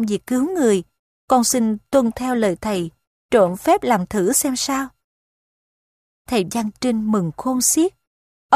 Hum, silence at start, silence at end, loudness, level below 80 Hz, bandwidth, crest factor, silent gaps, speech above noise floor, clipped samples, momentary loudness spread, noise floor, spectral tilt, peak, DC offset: none; 0 s; 0 s; -19 LUFS; -52 dBFS; 15.5 kHz; 20 dB; 0.99-1.28 s, 3.07-3.29 s, 5.04-6.25 s, 8.07-8.49 s; over 71 dB; under 0.1%; 7 LU; under -90 dBFS; -4 dB/octave; 0 dBFS; under 0.1%